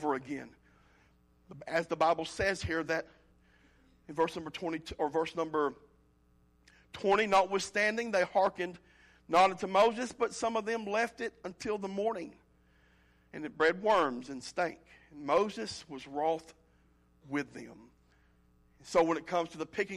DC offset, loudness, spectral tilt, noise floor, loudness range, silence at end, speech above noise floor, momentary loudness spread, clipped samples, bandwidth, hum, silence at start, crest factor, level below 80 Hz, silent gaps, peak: under 0.1%; -32 LUFS; -4 dB/octave; -67 dBFS; 6 LU; 0 s; 35 dB; 15 LU; under 0.1%; 13.5 kHz; none; 0 s; 16 dB; -62 dBFS; none; -16 dBFS